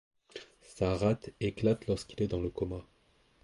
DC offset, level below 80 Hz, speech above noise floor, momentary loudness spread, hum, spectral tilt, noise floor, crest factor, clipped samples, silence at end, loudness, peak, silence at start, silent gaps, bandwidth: under 0.1%; -52 dBFS; 36 dB; 19 LU; none; -7 dB/octave; -68 dBFS; 18 dB; under 0.1%; 0.6 s; -33 LUFS; -16 dBFS; 0.35 s; none; 11.5 kHz